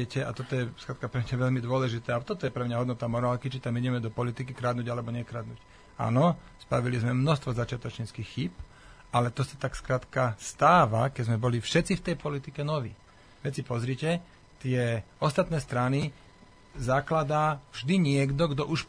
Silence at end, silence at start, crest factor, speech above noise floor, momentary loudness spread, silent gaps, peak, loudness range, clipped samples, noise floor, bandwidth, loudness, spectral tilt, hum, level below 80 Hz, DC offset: 0 s; 0 s; 20 dB; 26 dB; 11 LU; none; -8 dBFS; 5 LU; under 0.1%; -54 dBFS; 10.5 kHz; -29 LUFS; -6.5 dB/octave; none; -52 dBFS; under 0.1%